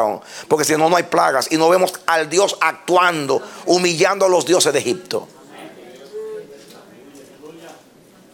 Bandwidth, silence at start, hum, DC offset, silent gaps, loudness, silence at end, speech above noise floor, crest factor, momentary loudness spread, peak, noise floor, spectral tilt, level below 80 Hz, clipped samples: 18 kHz; 0 s; none; under 0.1%; none; -16 LUFS; 0.6 s; 31 dB; 18 dB; 18 LU; 0 dBFS; -48 dBFS; -3 dB/octave; -66 dBFS; under 0.1%